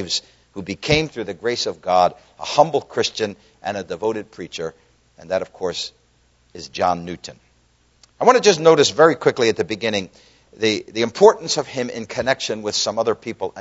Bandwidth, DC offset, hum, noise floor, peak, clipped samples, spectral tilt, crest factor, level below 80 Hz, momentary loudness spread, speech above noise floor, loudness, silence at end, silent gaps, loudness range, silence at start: 8 kHz; under 0.1%; none; -59 dBFS; 0 dBFS; under 0.1%; -3.5 dB/octave; 20 dB; -52 dBFS; 17 LU; 39 dB; -19 LUFS; 0 s; none; 10 LU; 0 s